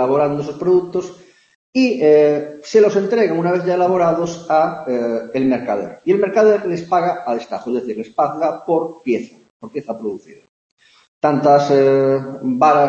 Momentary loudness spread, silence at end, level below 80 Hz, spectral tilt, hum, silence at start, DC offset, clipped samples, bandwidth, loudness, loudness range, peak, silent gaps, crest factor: 12 LU; 0 s; -60 dBFS; -7 dB/octave; none; 0 s; under 0.1%; under 0.1%; 7.6 kHz; -17 LUFS; 7 LU; -2 dBFS; 1.55-1.73 s, 9.50-9.60 s, 10.49-10.77 s, 11.08-11.21 s; 16 dB